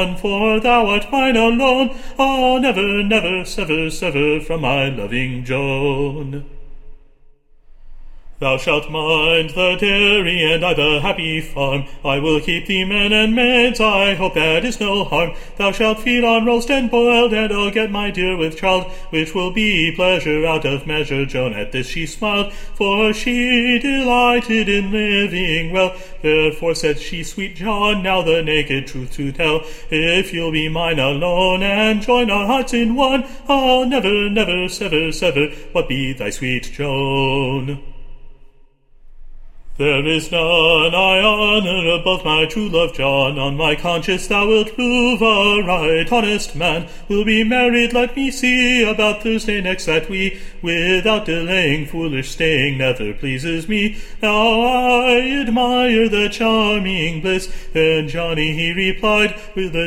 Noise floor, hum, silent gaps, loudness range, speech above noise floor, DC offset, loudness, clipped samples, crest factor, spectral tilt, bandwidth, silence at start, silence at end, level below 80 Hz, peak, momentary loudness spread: -47 dBFS; none; none; 5 LU; 30 dB; under 0.1%; -16 LUFS; under 0.1%; 16 dB; -4.5 dB/octave; 16 kHz; 0 s; 0 s; -32 dBFS; -2 dBFS; 8 LU